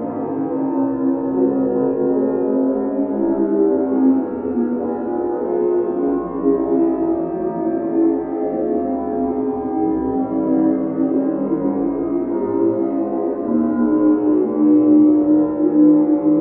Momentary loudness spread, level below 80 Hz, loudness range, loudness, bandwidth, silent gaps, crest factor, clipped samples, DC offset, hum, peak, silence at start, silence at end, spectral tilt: 7 LU; -50 dBFS; 4 LU; -18 LUFS; 2.6 kHz; none; 14 dB; under 0.1%; under 0.1%; none; -4 dBFS; 0 s; 0 s; -11 dB/octave